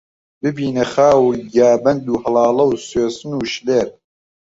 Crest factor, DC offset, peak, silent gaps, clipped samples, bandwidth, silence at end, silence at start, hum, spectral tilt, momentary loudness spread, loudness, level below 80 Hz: 14 dB; under 0.1%; -2 dBFS; none; under 0.1%; 8 kHz; 0.7 s; 0.45 s; none; -5.5 dB/octave; 10 LU; -16 LUFS; -52 dBFS